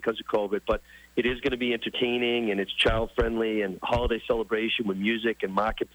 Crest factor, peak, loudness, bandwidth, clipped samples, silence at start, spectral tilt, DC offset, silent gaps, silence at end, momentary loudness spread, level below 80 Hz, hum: 14 dB; -14 dBFS; -27 LUFS; over 20 kHz; under 0.1%; 0 s; -6 dB/octave; under 0.1%; none; 0.1 s; 5 LU; -42 dBFS; none